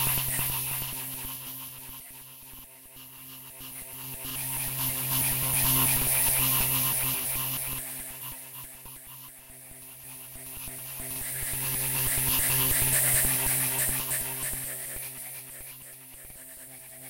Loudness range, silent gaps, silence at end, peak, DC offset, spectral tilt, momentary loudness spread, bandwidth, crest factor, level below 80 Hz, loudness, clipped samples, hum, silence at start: 14 LU; none; 0 s; -10 dBFS; under 0.1%; -1.5 dB/octave; 22 LU; 16 kHz; 20 dB; -48 dBFS; -26 LUFS; under 0.1%; none; 0 s